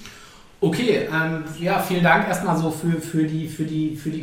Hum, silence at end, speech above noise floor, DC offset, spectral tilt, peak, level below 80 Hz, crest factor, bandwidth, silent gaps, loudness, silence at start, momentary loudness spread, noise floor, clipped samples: none; 0 s; 24 dB; under 0.1%; -6 dB/octave; -4 dBFS; -54 dBFS; 18 dB; 16.5 kHz; none; -22 LUFS; 0 s; 9 LU; -45 dBFS; under 0.1%